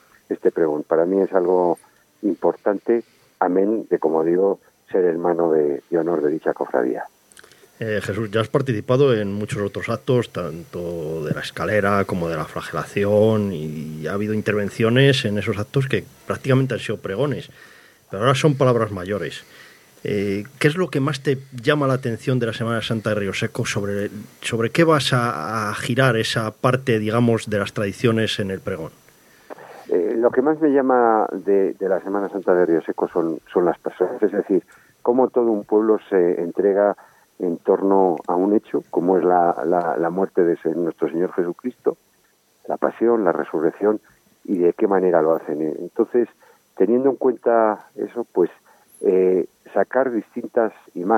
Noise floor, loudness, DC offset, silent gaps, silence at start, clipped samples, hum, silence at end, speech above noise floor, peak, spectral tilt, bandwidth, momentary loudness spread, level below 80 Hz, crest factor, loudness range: -61 dBFS; -21 LUFS; under 0.1%; none; 0.3 s; under 0.1%; none; 0 s; 41 dB; -2 dBFS; -6.5 dB/octave; 16 kHz; 10 LU; -60 dBFS; 18 dB; 3 LU